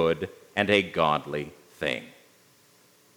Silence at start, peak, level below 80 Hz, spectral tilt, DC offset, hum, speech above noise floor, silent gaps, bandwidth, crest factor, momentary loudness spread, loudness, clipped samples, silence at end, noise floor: 0 s; -4 dBFS; -62 dBFS; -5 dB/octave; under 0.1%; none; 34 dB; none; over 20 kHz; 24 dB; 12 LU; -27 LUFS; under 0.1%; 1.05 s; -60 dBFS